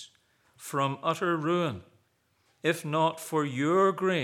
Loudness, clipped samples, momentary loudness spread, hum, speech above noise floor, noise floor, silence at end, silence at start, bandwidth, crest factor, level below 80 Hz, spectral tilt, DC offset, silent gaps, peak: -28 LUFS; under 0.1%; 9 LU; none; 43 dB; -71 dBFS; 0 s; 0 s; 17 kHz; 18 dB; -80 dBFS; -5.5 dB/octave; under 0.1%; none; -12 dBFS